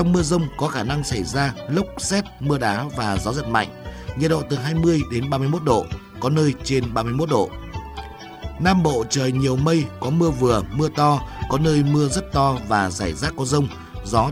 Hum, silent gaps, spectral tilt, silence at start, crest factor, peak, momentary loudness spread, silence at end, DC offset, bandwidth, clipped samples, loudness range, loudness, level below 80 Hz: none; none; -5.5 dB/octave; 0 s; 18 dB; -4 dBFS; 9 LU; 0 s; under 0.1%; 15 kHz; under 0.1%; 3 LU; -21 LUFS; -38 dBFS